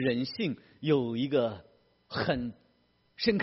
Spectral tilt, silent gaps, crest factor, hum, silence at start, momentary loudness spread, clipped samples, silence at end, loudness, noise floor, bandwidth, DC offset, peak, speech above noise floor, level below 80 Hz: -4.5 dB/octave; none; 18 dB; none; 0 s; 9 LU; under 0.1%; 0 s; -31 LUFS; -69 dBFS; 6 kHz; under 0.1%; -12 dBFS; 39 dB; -60 dBFS